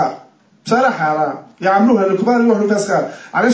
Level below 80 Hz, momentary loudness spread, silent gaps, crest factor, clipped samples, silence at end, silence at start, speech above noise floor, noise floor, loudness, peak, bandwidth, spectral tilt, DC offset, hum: -64 dBFS; 9 LU; none; 12 dB; under 0.1%; 0 s; 0 s; 31 dB; -45 dBFS; -15 LUFS; -2 dBFS; 8 kHz; -6 dB/octave; under 0.1%; none